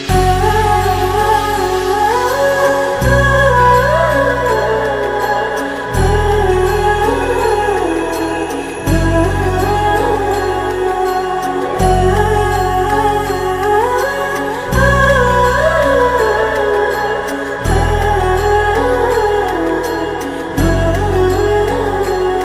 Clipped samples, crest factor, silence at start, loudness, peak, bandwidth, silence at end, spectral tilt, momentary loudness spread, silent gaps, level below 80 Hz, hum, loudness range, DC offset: under 0.1%; 14 dB; 0 s; -14 LUFS; 0 dBFS; 16 kHz; 0 s; -5.5 dB/octave; 7 LU; none; -24 dBFS; none; 3 LU; under 0.1%